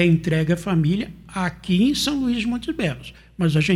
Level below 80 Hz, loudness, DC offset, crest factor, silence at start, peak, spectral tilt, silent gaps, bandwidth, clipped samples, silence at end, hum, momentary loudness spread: -44 dBFS; -22 LUFS; under 0.1%; 18 dB; 0 s; -4 dBFS; -6 dB/octave; none; 13.5 kHz; under 0.1%; 0 s; none; 8 LU